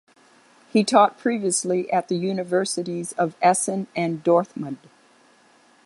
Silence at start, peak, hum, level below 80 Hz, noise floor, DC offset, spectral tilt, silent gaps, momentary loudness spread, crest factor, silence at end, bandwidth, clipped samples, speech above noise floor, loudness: 0.75 s; -2 dBFS; none; -72 dBFS; -56 dBFS; under 0.1%; -4.5 dB/octave; none; 10 LU; 20 dB; 1.1 s; 11.5 kHz; under 0.1%; 35 dB; -22 LUFS